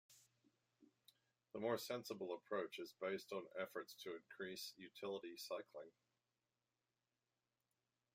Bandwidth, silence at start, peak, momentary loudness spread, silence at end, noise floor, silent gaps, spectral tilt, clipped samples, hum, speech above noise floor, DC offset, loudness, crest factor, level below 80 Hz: 16 kHz; 0.1 s; -28 dBFS; 9 LU; 2.25 s; under -90 dBFS; none; -4 dB/octave; under 0.1%; none; over 41 dB; under 0.1%; -49 LUFS; 24 dB; under -90 dBFS